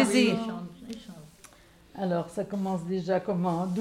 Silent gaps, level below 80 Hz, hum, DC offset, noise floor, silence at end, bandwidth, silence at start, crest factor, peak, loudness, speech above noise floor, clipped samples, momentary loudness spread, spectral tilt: none; -62 dBFS; none; under 0.1%; -55 dBFS; 0 s; 15.5 kHz; 0 s; 20 dB; -10 dBFS; -29 LUFS; 27 dB; under 0.1%; 18 LU; -5.5 dB/octave